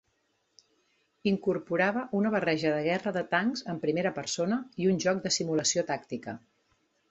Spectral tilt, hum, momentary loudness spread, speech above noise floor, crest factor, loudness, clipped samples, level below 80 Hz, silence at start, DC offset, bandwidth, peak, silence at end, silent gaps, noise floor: -4 dB/octave; none; 7 LU; 46 dB; 18 dB; -29 LUFS; under 0.1%; -70 dBFS; 1.25 s; under 0.1%; 8.2 kHz; -12 dBFS; 0.75 s; none; -75 dBFS